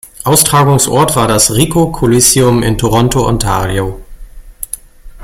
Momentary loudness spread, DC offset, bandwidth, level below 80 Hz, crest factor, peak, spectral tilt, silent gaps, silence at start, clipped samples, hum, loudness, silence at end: 16 LU; under 0.1%; over 20 kHz; -28 dBFS; 12 dB; 0 dBFS; -4.5 dB/octave; none; 0.05 s; 0.1%; none; -10 LUFS; 0 s